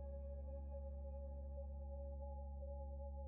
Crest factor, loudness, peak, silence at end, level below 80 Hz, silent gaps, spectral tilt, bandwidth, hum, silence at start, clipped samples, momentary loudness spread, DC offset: 8 dB; -51 LUFS; -42 dBFS; 0 s; -50 dBFS; none; -11.5 dB/octave; 1.8 kHz; none; 0 s; under 0.1%; 0 LU; under 0.1%